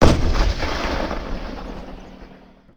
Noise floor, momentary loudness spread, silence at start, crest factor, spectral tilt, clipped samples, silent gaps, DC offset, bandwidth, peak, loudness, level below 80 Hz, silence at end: -46 dBFS; 21 LU; 0 s; 20 dB; -6 dB/octave; under 0.1%; none; under 0.1%; 9.8 kHz; 0 dBFS; -24 LUFS; -24 dBFS; 0.4 s